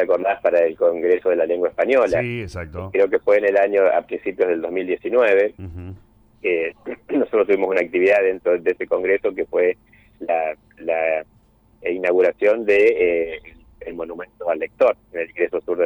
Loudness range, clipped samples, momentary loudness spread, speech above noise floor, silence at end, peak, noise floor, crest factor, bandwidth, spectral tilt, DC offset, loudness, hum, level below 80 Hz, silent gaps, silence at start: 3 LU; under 0.1%; 15 LU; 34 dB; 0 s; -6 dBFS; -54 dBFS; 14 dB; 7.2 kHz; -7 dB/octave; under 0.1%; -19 LUFS; none; -52 dBFS; none; 0 s